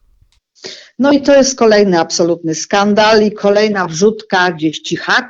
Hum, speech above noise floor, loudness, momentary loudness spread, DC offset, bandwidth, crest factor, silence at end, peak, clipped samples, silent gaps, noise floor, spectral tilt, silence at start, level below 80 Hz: none; 41 dB; -12 LUFS; 10 LU; under 0.1%; 8 kHz; 12 dB; 0 s; 0 dBFS; under 0.1%; none; -53 dBFS; -4 dB/octave; 0.65 s; -50 dBFS